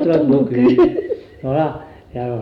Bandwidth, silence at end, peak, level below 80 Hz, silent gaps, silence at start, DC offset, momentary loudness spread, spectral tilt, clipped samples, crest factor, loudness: 5.8 kHz; 0 s; -4 dBFS; -46 dBFS; none; 0 s; under 0.1%; 15 LU; -10 dB/octave; under 0.1%; 12 dB; -16 LUFS